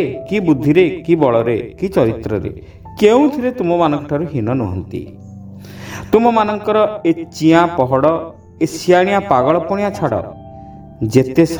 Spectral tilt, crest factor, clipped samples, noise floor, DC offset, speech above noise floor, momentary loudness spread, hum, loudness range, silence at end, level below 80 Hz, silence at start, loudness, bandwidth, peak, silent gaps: -7 dB/octave; 16 dB; under 0.1%; -35 dBFS; under 0.1%; 20 dB; 20 LU; none; 3 LU; 0 s; -44 dBFS; 0 s; -15 LUFS; 19.5 kHz; 0 dBFS; none